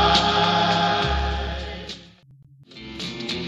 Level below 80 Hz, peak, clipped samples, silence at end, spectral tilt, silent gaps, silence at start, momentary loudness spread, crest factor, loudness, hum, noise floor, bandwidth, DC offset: -34 dBFS; -6 dBFS; under 0.1%; 0 s; -4.5 dB/octave; none; 0 s; 20 LU; 18 dB; -22 LUFS; none; -51 dBFS; 11.5 kHz; under 0.1%